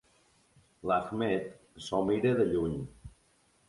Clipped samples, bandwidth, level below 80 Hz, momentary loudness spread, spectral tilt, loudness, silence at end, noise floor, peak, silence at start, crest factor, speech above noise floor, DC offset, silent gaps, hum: under 0.1%; 11.5 kHz; -56 dBFS; 16 LU; -7 dB/octave; -31 LUFS; 0.6 s; -68 dBFS; -14 dBFS; 0.85 s; 18 dB; 38 dB; under 0.1%; none; none